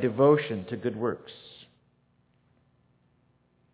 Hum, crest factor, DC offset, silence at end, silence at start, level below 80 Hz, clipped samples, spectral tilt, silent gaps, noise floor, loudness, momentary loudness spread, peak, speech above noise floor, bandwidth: 60 Hz at -65 dBFS; 22 dB; under 0.1%; 2.2 s; 0 s; -68 dBFS; under 0.1%; -6 dB/octave; none; -68 dBFS; -27 LUFS; 24 LU; -8 dBFS; 41 dB; 4 kHz